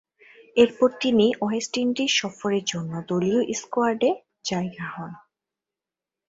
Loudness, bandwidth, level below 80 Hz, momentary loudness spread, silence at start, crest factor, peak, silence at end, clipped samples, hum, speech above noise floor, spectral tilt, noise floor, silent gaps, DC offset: -24 LUFS; 8 kHz; -62 dBFS; 11 LU; 0.55 s; 22 dB; -4 dBFS; 1.1 s; under 0.1%; none; 66 dB; -4.5 dB/octave; -89 dBFS; none; under 0.1%